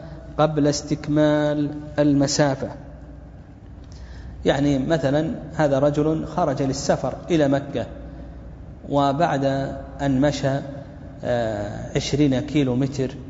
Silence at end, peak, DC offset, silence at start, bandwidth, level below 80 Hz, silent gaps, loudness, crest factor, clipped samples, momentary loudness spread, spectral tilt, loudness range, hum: 0 s; -4 dBFS; under 0.1%; 0 s; 8 kHz; -42 dBFS; none; -22 LUFS; 18 dB; under 0.1%; 20 LU; -6 dB/octave; 2 LU; none